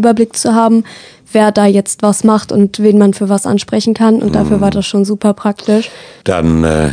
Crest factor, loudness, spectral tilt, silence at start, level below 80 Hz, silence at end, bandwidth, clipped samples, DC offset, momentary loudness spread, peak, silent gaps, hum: 10 dB; -11 LUFS; -6 dB/octave; 0 s; -34 dBFS; 0 s; 10 kHz; 0.3%; under 0.1%; 5 LU; 0 dBFS; none; none